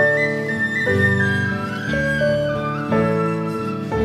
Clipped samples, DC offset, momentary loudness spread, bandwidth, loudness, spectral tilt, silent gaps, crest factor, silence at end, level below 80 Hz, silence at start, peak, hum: under 0.1%; under 0.1%; 7 LU; 15 kHz; -20 LUFS; -7 dB/octave; none; 14 dB; 0 s; -44 dBFS; 0 s; -6 dBFS; none